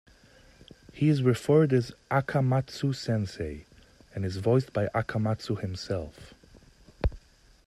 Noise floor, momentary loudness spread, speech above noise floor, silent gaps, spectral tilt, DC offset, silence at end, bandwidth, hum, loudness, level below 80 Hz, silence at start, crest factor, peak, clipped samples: -57 dBFS; 12 LU; 30 dB; none; -7.5 dB/octave; under 0.1%; 0.5 s; 13 kHz; none; -28 LUFS; -46 dBFS; 0.95 s; 18 dB; -10 dBFS; under 0.1%